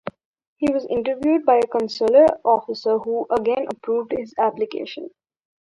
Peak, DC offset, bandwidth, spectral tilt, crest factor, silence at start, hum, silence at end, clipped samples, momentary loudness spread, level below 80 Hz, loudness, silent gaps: -4 dBFS; under 0.1%; 11 kHz; -6 dB/octave; 18 dB; 0.05 s; none; 0.55 s; under 0.1%; 12 LU; -58 dBFS; -20 LUFS; 0.25-0.34 s, 0.47-0.56 s